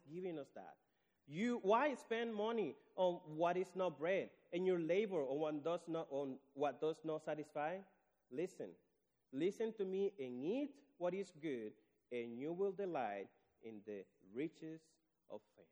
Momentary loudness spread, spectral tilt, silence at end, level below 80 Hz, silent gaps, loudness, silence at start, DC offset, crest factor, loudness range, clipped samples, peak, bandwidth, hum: 16 LU; -6.5 dB/octave; 0.1 s; under -90 dBFS; none; -43 LUFS; 0.05 s; under 0.1%; 20 dB; 6 LU; under 0.1%; -24 dBFS; over 20 kHz; none